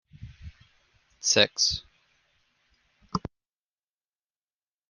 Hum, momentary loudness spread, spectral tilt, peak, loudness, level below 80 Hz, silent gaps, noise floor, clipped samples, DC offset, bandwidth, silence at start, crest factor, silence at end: none; 25 LU; -1.5 dB/octave; -4 dBFS; -25 LUFS; -56 dBFS; none; under -90 dBFS; under 0.1%; under 0.1%; 11.5 kHz; 0.2 s; 28 dB; 1.6 s